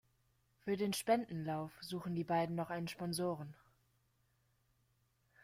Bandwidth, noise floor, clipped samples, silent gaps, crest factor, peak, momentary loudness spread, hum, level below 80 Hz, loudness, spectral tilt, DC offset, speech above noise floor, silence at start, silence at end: 16 kHz; -78 dBFS; under 0.1%; none; 22 dB; -20 dBFS; 9 LU; none; -76 dBFS; -40 LUFS; -5.5 dB/octave; under 0.1%; 39 dB; 0.65 s; 1.9 s